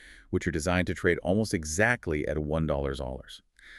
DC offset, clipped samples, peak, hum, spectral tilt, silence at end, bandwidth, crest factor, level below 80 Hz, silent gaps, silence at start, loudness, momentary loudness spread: under 0.1%; under 0.1%; -8 dBFS; none; -5.5 dB/octave; 0 s; 13.5 kHz; 20 dB; -42 dBFS; none; 0 s; -29 LUFS; 12 LU